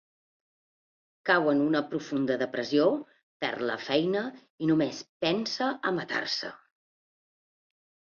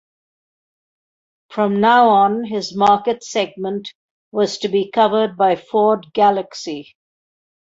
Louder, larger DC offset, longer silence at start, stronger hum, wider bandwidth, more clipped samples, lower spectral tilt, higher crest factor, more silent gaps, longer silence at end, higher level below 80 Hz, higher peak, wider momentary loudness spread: second, -28 LUFS vs -17 LUFS; neither; second, 1.25 s vs 1.5 s; neither; second, 7.2 kHz vs 8 kHz; neither; about the same, -5 dB/octave vs -5 dB/octave; about the same, 20 dB vs 16 dB; about the same, 3.23-3.40 s, 4.50-4.58 s, 5.09-5.20 s vs 3.95-4.32 s; first, 1.55 s vs 0.85 s; second, -72 dBFS vs -64 dBFS; second, -10 dBFS vs -2 dBFS; second, 8 LU vs 15 LU